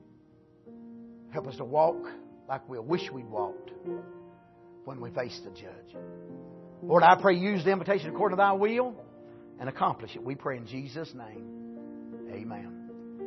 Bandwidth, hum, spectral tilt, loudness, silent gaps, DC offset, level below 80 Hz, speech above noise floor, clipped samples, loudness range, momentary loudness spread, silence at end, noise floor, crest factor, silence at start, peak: 6.2 kHz; none; -7 dB/octave; -29 LUFS; none; under 0.1%; -72 dBFS; 30 dB; under 0.1%; 14 LU; 23 LU; 0 s; -59 dBFS; 24 dB; 0.65 s; -6 dBFS